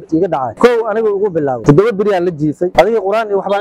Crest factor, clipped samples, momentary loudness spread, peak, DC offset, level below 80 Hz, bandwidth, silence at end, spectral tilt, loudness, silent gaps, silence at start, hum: 12 dB; 0.3%; 5 LU; 0 dBFS; under 0.1%; -42 dBFS; 14 kHz; 0 s; -7.5 dB/octave; -13 LUFS; none; 0 s; none